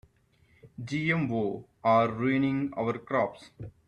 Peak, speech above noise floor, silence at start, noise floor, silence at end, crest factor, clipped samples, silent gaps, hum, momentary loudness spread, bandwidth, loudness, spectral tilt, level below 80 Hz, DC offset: -12 dBFS; 37 dB; 0.65 s; -65 dBFS; 0.2 s; 18 dB; under 0.1%; none; none; 12 LU; 9.6 kHz; -28 LUFS; -7.5 dB/octave; -62 dBFS; under 0.1%